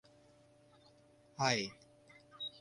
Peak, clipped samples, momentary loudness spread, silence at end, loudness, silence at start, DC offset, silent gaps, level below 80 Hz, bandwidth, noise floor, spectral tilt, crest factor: -16 dBFS; under 0.1%; 23 LU; 0.05 s; -37 LUFS; 1.4 s; under 0.1%; none; -76 dBFS; 11.5 kHz; -66 dBFS; -3 dB/octave; 26 dB